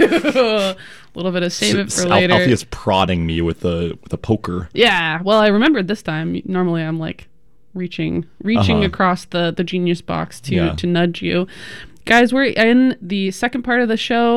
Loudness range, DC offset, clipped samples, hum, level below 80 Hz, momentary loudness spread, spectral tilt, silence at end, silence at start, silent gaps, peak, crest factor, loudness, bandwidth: 3 LU; 0.7%; under 0.1%; none; -42 dBFS; 12 LU; -5 dB/octave; 0 s; 0 s; none; -2 dBFS; 16 dB; -17 LUFS; 14.5 kHz